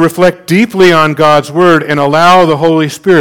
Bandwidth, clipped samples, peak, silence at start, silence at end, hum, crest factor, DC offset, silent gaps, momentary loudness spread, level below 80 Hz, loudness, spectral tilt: 18.5 kHz; 4%; 0 dBFS; 0 s; 0 s; none; 8 dB; under 0.1%; none; 5 LU; -44 dBFS; -8 LUFS; -5.5 dB/octave